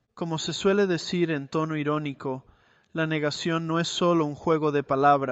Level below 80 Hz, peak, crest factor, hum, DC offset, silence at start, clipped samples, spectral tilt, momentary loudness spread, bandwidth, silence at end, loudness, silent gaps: -62 dBFS; -8 dBFS; 18 dB; none; under 0.1%; 0.15 s; under 0.1%; -5.5 dB/octave; 10 LU; 8.2 kHz; 0 s; -26 LUFS; none